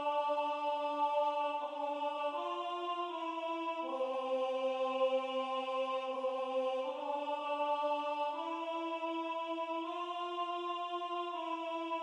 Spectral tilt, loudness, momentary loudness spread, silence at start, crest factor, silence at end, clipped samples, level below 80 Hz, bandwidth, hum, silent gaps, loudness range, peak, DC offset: -2 dB/octave; -37 LUFS; 5 LU; 0 s; 14 dB; 0 s; under 0.1%; under -90 dBFS; 10 kHz; none; none; 3 LU; -22 dBFS; under 0.1%